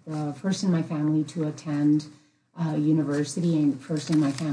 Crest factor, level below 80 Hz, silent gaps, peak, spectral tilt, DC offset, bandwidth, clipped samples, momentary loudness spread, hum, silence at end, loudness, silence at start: 12 dB; -74 dBFS; none; -14 dBFS; -7 dB/octave; under 0.1%; 10.5 kHz; under 0.1%; 7 LU; none; 0 s; -26 LUFS; 0.05 s